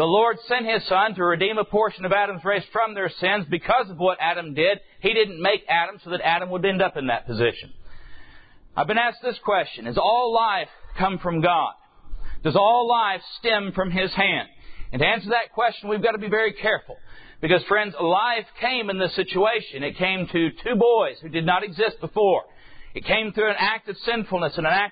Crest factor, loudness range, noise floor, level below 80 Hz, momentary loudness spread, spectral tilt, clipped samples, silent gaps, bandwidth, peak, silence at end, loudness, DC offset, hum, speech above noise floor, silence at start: 16 dB; 2 LU; -47 dBFS; -48 dBFS; 6 LU; -9.5 dB/octave; under 0.1%; none; 5 kHz; -6 dBFS; 0 s; -22 LUFS; under 0.1%; none; 24 dB; 0 s